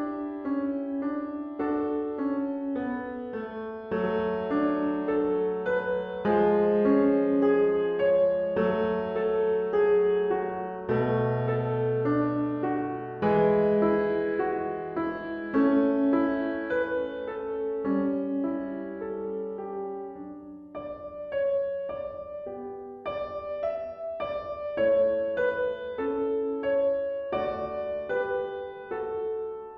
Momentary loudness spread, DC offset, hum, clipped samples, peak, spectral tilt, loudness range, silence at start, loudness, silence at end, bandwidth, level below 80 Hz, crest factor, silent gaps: 12 LU; under 0.1%; none; under 0.1%; -12 dBFS; -6.5 dB/octave; 9 LU; 0 s; -28 LUFS; 0 s; 5.2 kHz; -58 dBFS; 16 dB; none